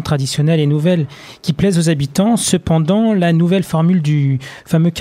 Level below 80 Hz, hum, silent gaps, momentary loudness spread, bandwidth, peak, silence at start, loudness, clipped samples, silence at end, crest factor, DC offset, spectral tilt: -44 dBFS; none; none; 5 LU; 15 kHz; -2 dBFS; 0 s; -15 LUFS; under 0.1%; 0 s; 12 dB; under 0.1%; -6 dB/octave